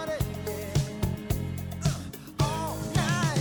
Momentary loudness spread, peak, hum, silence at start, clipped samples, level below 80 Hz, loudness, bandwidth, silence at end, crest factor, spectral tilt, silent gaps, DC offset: 8 LU; -14 dBFS; none; 0 s; under 0.1%; -42 dBFS; -30 LUFS; over 20 kHz; 0 s; 14 dB; -5.5 dB/octave; none; under 0.1%